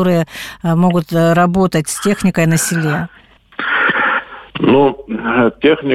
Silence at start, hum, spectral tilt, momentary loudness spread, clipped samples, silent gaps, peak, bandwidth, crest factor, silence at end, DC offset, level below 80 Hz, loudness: 0 s; none; -5.5 dB/octave; 10 LU; under 0.1%; none; -2 dBFS; 15.5 kHz; 12 dB; 0 s; under 0.1%; -44 dBFS; -14 LUFS